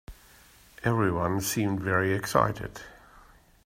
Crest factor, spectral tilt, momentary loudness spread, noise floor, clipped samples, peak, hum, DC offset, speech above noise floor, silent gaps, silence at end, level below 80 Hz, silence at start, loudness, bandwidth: 22 dB; -5.5 dB/octave; 14 LU; -56 dBFS; under 0.1%; -6 dBFS; none; under 0.1%; 29 dB; none; 0.7 s; -52 dBFS; 0.1 s; -27 LUFS; 16 kHz